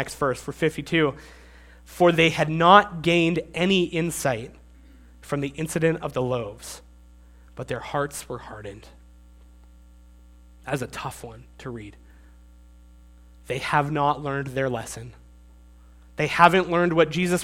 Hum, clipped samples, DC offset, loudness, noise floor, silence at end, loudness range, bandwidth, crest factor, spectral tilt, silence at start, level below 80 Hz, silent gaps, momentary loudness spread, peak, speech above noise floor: 60 Hz at -50 dBFS; under 0.1%; under 0.1%; -23 LUFS; -50 dBFS; 0 s; 17 LU; 16.5 kHz; 26 dB; -5 dB/octave; 0 s; -50 dBFS; none; 23 LU; 0 dBFS; 26 dB